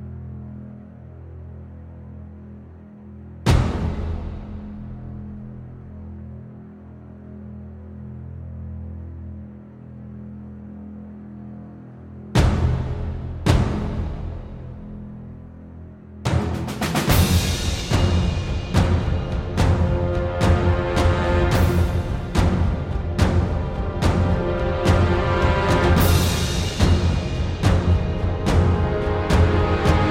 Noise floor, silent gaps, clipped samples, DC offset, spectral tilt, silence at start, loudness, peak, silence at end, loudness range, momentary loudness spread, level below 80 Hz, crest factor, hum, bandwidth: -41 dBFS; none; under 0.1%; under 0.1%; -6 dB/octave; 0 s; -21 LUFS; -2 dBFS; 0 s; 18 LU; 21 LU; -28 dBFS; 20 dB; none; 16.5 kHz